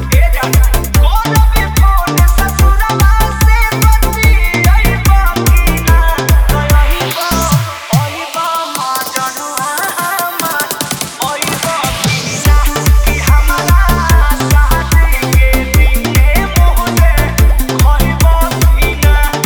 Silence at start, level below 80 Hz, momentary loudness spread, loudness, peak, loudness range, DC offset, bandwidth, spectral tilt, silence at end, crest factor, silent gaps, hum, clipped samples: 0 s; -10 dBFS; 5 LU; -11 LUFS; 0 dBFS; 4 LU; under 0.1%; over 20 kHz; -4.5 dB/octave; 0 s; 10 dB; none; none; under 0.1%